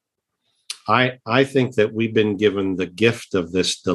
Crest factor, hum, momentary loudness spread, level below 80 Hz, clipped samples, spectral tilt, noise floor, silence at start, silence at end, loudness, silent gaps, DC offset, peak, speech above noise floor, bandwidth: 20 dB; none; 6 LU; -60 dBFS; under 0.1%; -5 dB/octave; -75 dBFS; 0.7 s; 0 s; -20 LUFS; none; under 0.1%; -2 dBFS; 55 dB; 12.5 kHz